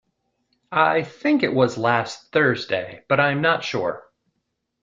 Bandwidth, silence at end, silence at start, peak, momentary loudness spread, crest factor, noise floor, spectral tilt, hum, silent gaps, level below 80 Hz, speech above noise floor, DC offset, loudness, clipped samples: 7.6 kHz; 0.8 s; 0.7 s; -4 dBFS; 8 LU; 20 dB; -76 dBFS; -5.5 dB/octave; none; none; -62 dBFS; 55 dB; under 0.1%; -21 LUFS; under 0.1%